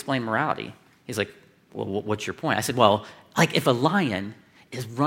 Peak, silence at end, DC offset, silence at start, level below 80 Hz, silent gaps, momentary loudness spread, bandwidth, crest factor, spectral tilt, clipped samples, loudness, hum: -2 dBFS; 0 s; under 0.1%; 0 s; -66 dBFS; none; 17 LU; 16.5 kHz; 24 dB; -5 dB/octave; under 0.1%; -25 LUFS; none